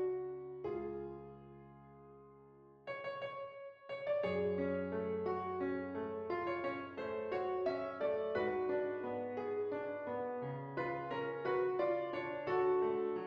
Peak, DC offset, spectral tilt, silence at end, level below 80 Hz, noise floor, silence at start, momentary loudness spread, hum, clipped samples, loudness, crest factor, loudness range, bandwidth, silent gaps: -24 dBFS; under 0.1%; -5.5 dB/octave; 0 s; -74 dBFS; -61 dBFS; 0 s; 15 LU; none; under 0.1%; -39 LUFS; 16 dB; 8 LU; 5.8 kHz; none